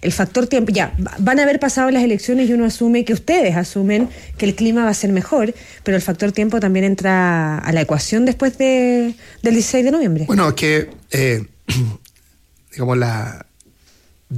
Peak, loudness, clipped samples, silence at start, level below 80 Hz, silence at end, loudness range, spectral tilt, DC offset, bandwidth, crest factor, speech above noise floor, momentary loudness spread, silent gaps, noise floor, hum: -4 dBFS; -17 LUFS; under 0.1%; 0 s; -40 dBFS; 0 s; 3 LU; -5.5 dB/octave; under 0.1%; 15.5 kHz; 12 dB; 37 dB; 7 LU; none; -53 dBFS; none